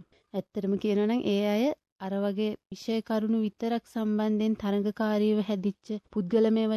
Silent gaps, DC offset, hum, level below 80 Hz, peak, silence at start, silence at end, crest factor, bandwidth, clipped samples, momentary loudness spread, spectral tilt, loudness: 1.92-1.96 s; under 0.1%; none; -66 dBFS; -14 dBFS; 0.35 s; 0 s; 14 dB; 13 kHz; under 0.1%; 9 LU; -7.5 dB/octave; -29 LUFS